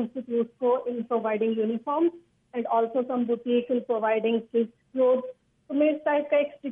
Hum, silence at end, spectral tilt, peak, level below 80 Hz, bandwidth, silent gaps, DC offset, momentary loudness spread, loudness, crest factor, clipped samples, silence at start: none; 0 s; -8.5 dB/octave; -12 dBFS; -78 dBFS; 3.7 kHz; none; under 0.1%; 5 LU; -26 LUFS; 14 dB; under 0.1%; 0 s